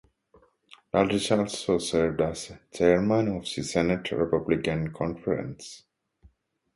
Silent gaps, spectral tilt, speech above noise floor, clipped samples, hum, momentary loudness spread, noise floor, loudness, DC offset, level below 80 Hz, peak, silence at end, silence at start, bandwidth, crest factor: none; -5.5 dB/octave; 36 dB; under 0.1%; none; 8 LU; -62 dBFS; -26 LUFS; under 0.1%; -52 dBFS; -8 dBFS; 0.95 s; 0.95 s; 11.5 kHz; 20 dB